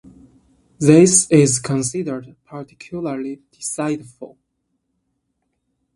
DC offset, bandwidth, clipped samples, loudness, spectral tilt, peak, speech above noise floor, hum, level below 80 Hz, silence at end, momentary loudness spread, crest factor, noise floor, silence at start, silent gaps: under 0.1%; 11.5 kHz; under 0.1%; -17 LUFS; -5 dB/octave; 0 dBFS; 55 dB; none; -56 dBFS; 1.7 s; 24 LU; 20 dB; -72 dBFS; 0.8 s; none